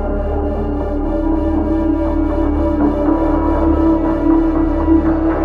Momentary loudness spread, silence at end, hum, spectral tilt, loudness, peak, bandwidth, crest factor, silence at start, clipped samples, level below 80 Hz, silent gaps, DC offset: 6 LU; 0 s; none; -10.5 dB/octave; -16 LUFS; 0 dBFS; 4.5 kHz; 14 dB; 0 s; under 0.1%; -22 dBFS; none; under 0.1%